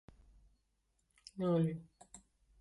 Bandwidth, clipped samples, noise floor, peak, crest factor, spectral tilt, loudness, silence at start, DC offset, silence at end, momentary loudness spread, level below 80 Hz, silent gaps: 11.5 kHz; under 0.1%; -80 dBFS; -24 dBFS; 16 dB; -8 dB/octave; -37 LUFS; 1.35 s; under 0.1%; 0.45 s; 25 LU; -68 dBFS; none